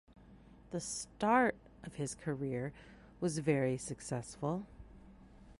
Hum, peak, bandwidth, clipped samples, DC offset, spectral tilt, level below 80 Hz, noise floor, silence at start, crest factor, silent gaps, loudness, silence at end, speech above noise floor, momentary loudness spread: none; -16 dBFS; 11.5 kHz; under 0.1%; under 0.1%; -5.5 dB/octave; -62 dBFS; -59 dBFS; 0.15 s; 22 dB; none; -37 LUFS; 0.05 s; 23 dB; 20 LU